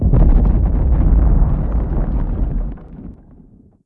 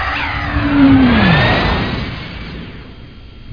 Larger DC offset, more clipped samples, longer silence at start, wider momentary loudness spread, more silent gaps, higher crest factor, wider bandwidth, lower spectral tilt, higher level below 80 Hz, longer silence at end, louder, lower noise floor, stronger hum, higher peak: second, under 0.1% vs 0.5%; neither; about the same, 0 s vs 0 s; about the same, 20 LU vs 20 LU; neither; about the same, 14 dB vs 14 dB; second, 2.4 kHz vs 5.2 kHz; first, -13 dB/octave vs -8 dB/octave; first, -16 dBFS vs -26 dBFS; first, 0.75 s vs 0 s; second, -17 LUFS vs -12 LUFS; first, -45 dBFS vs -34 dBFS; neither; about the same, 0 dBFS vs 0 dBFS